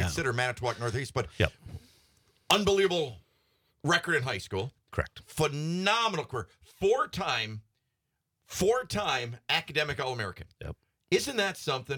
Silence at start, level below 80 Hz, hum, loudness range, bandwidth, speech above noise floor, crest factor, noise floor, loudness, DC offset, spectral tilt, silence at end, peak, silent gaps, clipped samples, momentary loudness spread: 0 s; -54 dBFS; none; 2 LU; 19 kHz; 52 dB; 24 dB; -82 dBFS; -30 LUFS; under 0.1%; -4 dB/octave; 0 s; -6 dBFS; none; under 0.1%; 14 LU